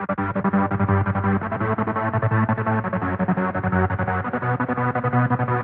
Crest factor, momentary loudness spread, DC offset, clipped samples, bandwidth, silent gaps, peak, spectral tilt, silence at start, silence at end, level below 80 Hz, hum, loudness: 16 dB; 3 LU; under 0.1%; under 0.1%; 4 kHz; none; -6 dBFS; -12 dB/octave; 0 s; 0 s; -48 dBFS; none; -22 LUFS